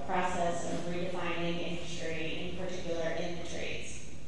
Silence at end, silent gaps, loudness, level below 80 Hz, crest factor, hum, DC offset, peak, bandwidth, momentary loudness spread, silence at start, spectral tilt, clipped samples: 0 s; none; -36 LUFS; -54 dBFS; 18 dB; none; 2%; -18 dBFS; 11.5 kHz; 6 LU; 0 s; -4.5 dB/octave; under 0.1%